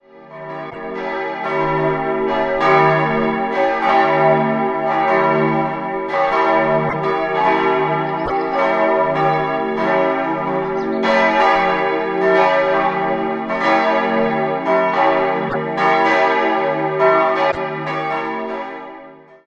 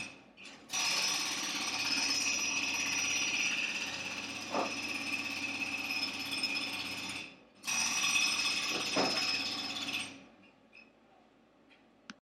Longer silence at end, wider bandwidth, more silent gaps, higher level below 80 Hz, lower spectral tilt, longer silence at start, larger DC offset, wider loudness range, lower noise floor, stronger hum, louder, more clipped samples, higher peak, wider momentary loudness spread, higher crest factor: first, 0.3 s vs 0.1 s; second, 7.8 kHz vs 16.5 kHz; neither; first, -50 dBFS vs -76 dBFS; first, -6.5 dB/octave vs 0 dB/octave; first, 0.15 s vs 0 s; neither; about the same, 2 LU vs 4 LU; second, -40 dBFS vs -64 dBFS; neither; first, -17 LUFS vs -32 LUFS; neither; first, 0 dBFS vs -18 dBFS; about the same, 8 LU vs 9 LU; about the same, 16 dB vs 18 dB